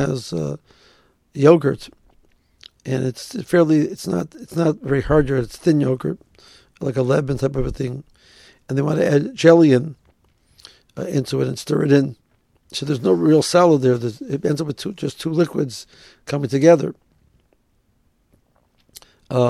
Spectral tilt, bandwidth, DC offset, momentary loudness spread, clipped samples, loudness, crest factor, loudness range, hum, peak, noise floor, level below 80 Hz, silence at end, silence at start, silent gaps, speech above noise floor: -6.5 dB/octave; 13.5 kHz; under 0.1%; 15 LU; under 0.1%; -19 LUFS; 20 dB; 4 LU; none; 0 dBFS; -63 dBFS; -44 dBFS; 0 s; 0 s; none; 45 dB